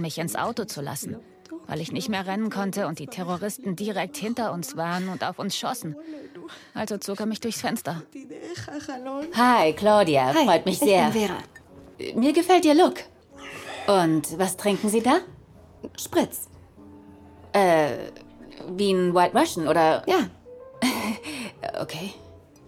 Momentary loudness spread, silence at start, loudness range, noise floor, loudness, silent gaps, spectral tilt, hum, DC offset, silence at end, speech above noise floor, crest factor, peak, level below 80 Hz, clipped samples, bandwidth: 19 LU; 0 s; 9 LU; -49 dBFS; -24 LUFS; none; -4.5 dB/octave; none; under 0.1%; 0.3 s; 25 dB; 20 dB; -4 dBFS; -62 dBFS; under 0.1%; 17.5 kHz